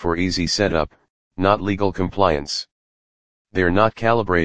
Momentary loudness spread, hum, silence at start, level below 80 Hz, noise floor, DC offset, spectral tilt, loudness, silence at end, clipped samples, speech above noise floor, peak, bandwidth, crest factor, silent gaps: 10 LU; none; 0 s; -40 dBFS; under -90 dBFS; 2%; -5 dB/octave; -20 LUFS; 0 s; under 0.1%; over 71 dB; 0 dBFS; 10 kHz; 20 dB; 1.10-1.31 s, 2.72-3.45 s